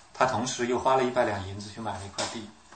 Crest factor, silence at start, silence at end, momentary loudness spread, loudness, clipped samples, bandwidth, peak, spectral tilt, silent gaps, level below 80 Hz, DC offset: 22 dB; 0.15 s; 0.25 s; 12 LU; -28 LUFS; under 0.1%; 8.8 kHz; -8 dBFS; -4 dB/octave; none; -62 dBFS; under 0.1%